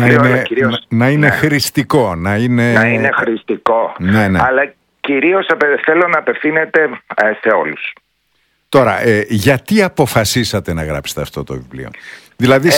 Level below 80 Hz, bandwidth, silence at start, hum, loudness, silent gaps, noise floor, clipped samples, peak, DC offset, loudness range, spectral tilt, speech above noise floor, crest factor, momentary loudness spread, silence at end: -42 dBFS; 18 kHz; 0 s; none; -13 LUFS; none; -61 dBFS; 0.2%; 0 dBFS; under 0.1%; 2 LU; -5.5 dB/octave; 48 dB; 14 dB; 11 LU; 0 s